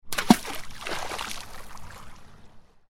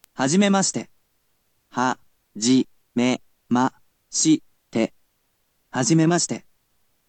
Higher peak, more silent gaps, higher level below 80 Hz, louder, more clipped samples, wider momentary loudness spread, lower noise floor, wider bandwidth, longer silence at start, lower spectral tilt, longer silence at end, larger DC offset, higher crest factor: first, -2 dBFS vs -6 dBFS; neither; first, -46 dBFS vs -70 dBFS; second, -27 LUFS vs -22 LUFS; neither; first, 23 LU vs 15 LU; second, -48 dBFS vs -69 dBFS; first, 16.5 kHz vs 9.2 kHz; second, 0.05 s vs 0.2 s; about the same, -4 dB/octave vs -4 dB/octave; second, 0.25 s vs 0.7 s; neither; first, 28 dB vs 18 dB